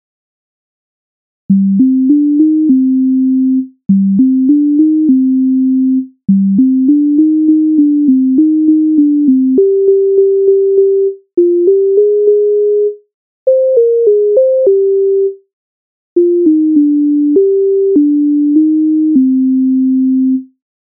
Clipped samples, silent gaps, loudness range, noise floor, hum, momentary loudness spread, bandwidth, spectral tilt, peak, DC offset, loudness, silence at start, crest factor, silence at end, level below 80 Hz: under 0.1%; 13.14-13.46 s, 15.53-16.16 s; 2 LU; under -90 dBFS; none; 4 LU; 0.8 kHz; -18.5 dB/octave; 0 dBFS; under 0.1%; -10 LUFS; 1.5 s; 8 dB; 0.4 s; -62 dBFS